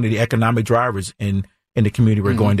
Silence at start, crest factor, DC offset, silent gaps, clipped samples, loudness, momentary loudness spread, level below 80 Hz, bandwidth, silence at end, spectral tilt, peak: 0 s; 12 dB; under 0.1%; none; under 0.1%; -19 LUFS; 8 LU; -46 dBFS; 13.5 kHz; 0 s; -7 dB/octave; -6 dBFS